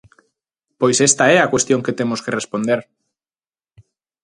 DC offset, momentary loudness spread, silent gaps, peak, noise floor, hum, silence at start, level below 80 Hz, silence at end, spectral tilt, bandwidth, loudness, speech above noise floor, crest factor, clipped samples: under 0.1%; 10 LU; none; 0 dBFS; under -90 dBFS; none; 0.8 s; -58 dBFS; 1.4 s; -3.5 dB/octave; 11.5 kHz; -16 LUFS; over 74 dB; 20 dB; under 0.1%